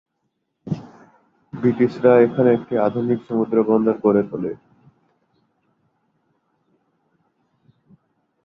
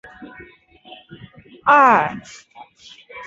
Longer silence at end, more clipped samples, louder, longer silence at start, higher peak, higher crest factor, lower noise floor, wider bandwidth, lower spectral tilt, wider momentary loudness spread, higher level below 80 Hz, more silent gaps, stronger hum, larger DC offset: first, 3.9 s vs 0 s; neither; second, -19 LUFS vs -15 LUFS; first, 0.65 s vs 0.2 s; about the same, -2 dBFS vs -2 dBFS; about the same, 20 dB vs 20 dB; first, -74 dBFS vs -47 dBFS; second, 5.8 kHz vs 8 kHz; first, -10 dB/octave vs -5 dB/octave; second, 16 LU vs 28 LU; about the same, -62 dBFS vs -60 dBFS; neither; neither; neither